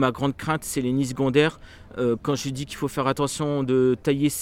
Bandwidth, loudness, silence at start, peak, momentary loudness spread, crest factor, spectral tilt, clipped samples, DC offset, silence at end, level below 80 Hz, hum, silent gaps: 17 kHz; -24 LUFS; 0 s; -6 dBFS; 7 LU; 18 dB; -5.5 dB/octave; under 0.1%; under 0.1%; 0 s; -50 dBFS; none; none